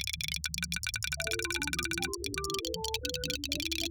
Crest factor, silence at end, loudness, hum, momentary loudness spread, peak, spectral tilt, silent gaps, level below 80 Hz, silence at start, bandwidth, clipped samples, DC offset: 22 dB; 0 s; -33 LUFS; none; 2 LU; -14 dBFS; -2 dB/octave; none; -48 dBFS; 0 s; over 20 kHz; under 0.1%; under 0.1%